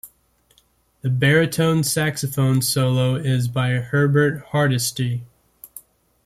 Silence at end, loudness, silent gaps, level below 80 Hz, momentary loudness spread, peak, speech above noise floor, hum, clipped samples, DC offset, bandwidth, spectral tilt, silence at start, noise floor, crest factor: 0.45 s; -20 LUFS; none; -54 dBFS; 10 LU; -4 dBFS; 42 dB; none; under 0.1%; under 0.1%; 15.5 kHz; -5 dB/octave; 0.05 s; -61 dBFS; 16 dB